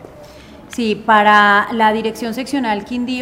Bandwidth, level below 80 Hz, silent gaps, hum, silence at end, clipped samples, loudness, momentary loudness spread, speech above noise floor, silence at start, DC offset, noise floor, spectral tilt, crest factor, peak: 16 kHz; -50 dBFS; none; none; 0 s; under 0.1%; -14 LUFS; 12 LU; 24 dB; 0 s; under 0.1%; -38 dBFS; -4.5 dB/octave; 16 dB; 0 dBFS